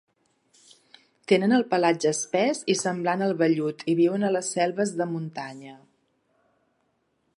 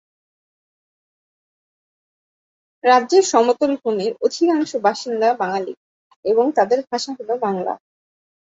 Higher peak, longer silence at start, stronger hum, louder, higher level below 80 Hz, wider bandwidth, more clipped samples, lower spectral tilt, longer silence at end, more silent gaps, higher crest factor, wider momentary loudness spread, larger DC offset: second, -6 dBFS vs -2 dBFS; second, 1.3 s vs 2.85 s; neither; second, -24 LUFS vs -19 LUFS; second, -78 dBFS vs -70 dBFS; first, 11 kHz vs 8 kHz; neither; about the same, -4.5 dB/octave vs -4 dB/octave; first, 1.6 s vs 0.7 s; second, none vs 5.77-6.10 s, 6.16-6.23 s; about the same, 20 dB vs 20 dB; about the same, 12 LU vs 11 LU; neither